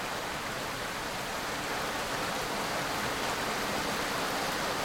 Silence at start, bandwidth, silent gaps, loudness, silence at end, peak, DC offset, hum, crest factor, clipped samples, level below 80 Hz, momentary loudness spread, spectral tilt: 0 s; 19 kHz; none; -32 LUFS; 0 s; -18 dBFS; under 0.1%; none; 14 dB; under 0.1%; -54 dBFS; 3 LU; -2.5 dB/octave